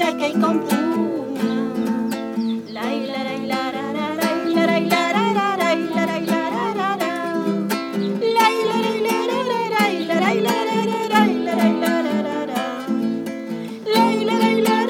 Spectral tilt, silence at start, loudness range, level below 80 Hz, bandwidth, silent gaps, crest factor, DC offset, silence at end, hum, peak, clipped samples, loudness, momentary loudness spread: -5 dB/octave; 0 s; 3 LU; -70 dBFS; 19 kHz; none; 16 dB; under 0.1%; 0 s; none; -4 dBFS; under 0.1%; -20 LUFS; 7 LU